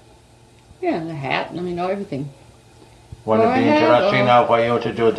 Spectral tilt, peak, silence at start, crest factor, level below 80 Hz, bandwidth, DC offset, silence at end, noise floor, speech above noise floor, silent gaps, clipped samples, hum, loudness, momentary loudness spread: -6.5 dB/octave; -2 dBFS; 0.8 s; 18 dB; -54 dBFS; 11 kHz; under 0.1%; 0 s; -49 dBFS; 32 dB; none; under 0.1%; none; -18 LUFS; 13 LU